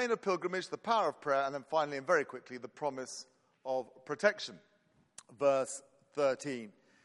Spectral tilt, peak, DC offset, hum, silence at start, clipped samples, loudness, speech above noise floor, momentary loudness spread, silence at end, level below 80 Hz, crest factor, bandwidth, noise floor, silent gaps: -3.5 dB/octave; -12 dBFS; under 0.1%; none; 0 s; under 0.1%; -35 LUFS; 25 dB; 15 LU; 0.35 s; -84 dBFS; 22 dB; 11.5 kHz; -60 dBFS; none